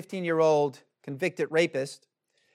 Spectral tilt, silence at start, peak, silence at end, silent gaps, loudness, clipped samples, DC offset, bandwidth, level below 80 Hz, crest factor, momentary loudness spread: -5.5 dB/octave; 0 s; -12 dBFS; 0.6 s; none; -27 LUFS; under 0.1%; under 0.1%; 13.5 kHz; -84 dBFS; 16 dB; 15 LU